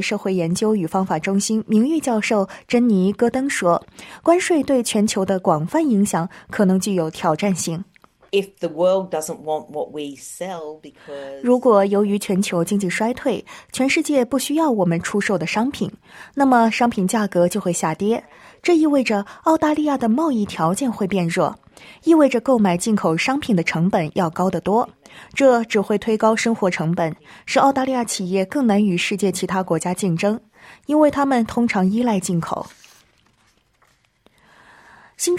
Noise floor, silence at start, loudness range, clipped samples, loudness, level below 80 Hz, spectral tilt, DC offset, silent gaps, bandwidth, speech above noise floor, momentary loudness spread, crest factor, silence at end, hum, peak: -61 dBFS; 0 s; 4 LU; under 0.1%; -19 LUFS; -58 dBFS; -5.5 dB/octave; under 0.1%; none; 15.5 kHz; 42 dB; 11 LU; 16 dB; 0 s; none; -2 dBFS